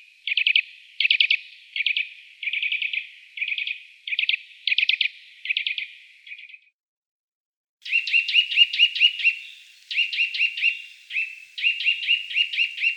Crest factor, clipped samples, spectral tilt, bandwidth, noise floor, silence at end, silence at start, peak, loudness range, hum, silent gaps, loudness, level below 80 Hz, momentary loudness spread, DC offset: 22 dB; under 0.1%; 8.5 dB/octave; 16.5 kHz; -45 dBFS; 0 s; 0.25 s; -4 dBFS; 6 LU; none; 6.73-7.77 s; -21 LUFS; under -90 dBFS; 16 LU; under 0.1%